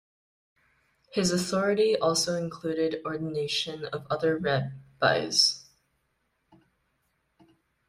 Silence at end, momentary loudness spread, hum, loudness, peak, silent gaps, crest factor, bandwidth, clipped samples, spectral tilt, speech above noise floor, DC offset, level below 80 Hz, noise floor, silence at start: 2.25 s; 10 LU; none; -27 LUFS; -8 dBFS; none; 22 dB; 15.5 kHz; under 0.1%; -3.5 dB/octave; 48 dB; under 0.1%; -64 dBFS; -75 dBFS; 1.15 s